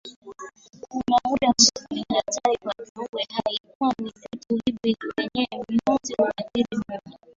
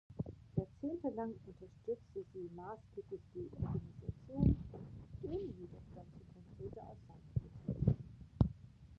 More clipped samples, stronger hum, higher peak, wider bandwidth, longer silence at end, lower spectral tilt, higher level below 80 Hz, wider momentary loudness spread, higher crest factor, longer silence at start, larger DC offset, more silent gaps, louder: neither; neither; first, -2 dBFS vs -16 dBFS; first, 7.8 kHz vs 6 kHz; first, 0.25 s vs 0.05 s; second, -2.5 dB/octave vs -11 dB/octave; second, -58 dBFS vs -50 dBFS; about the same, 17 LU vs 19 LU; about the same, 24 dB vs 26 dB; about the same, 0.05 s vs 0.1 s; neither; first, 0.16-0.22 s, 2.89-2.95 s, 3.09-3.13 s, 3.60-3.64 s, 3.75-3.80 s vs none; first, -24 LUFS vs -43 LUFS